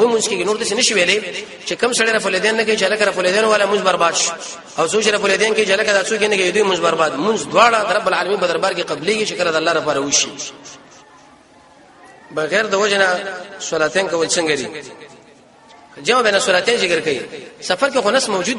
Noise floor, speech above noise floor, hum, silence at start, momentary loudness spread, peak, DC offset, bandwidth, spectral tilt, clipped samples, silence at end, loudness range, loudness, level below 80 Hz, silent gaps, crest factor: -47 dBFS; 30 dB; none; 0 s; 10 LU; 0 dBFS; under 0.1%; 11.5 kHz; -2 dB/octave; under 0.1%; 0 s; 5 LU; -16 LUFS; -60 dBFS; none; 18 dB